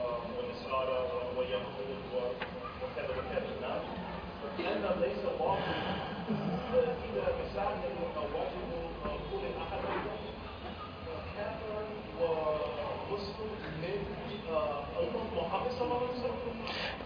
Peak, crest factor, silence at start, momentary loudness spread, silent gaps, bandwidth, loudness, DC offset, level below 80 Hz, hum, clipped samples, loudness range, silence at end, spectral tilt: -18 dBFS; 18 dB; 0 s; 8 LU; none; 5.2 kHz; -36 LUFS; under 0.1%; -52 dBFS; none; under 0.1%; 4 LU; 0 s; -4 dB/octave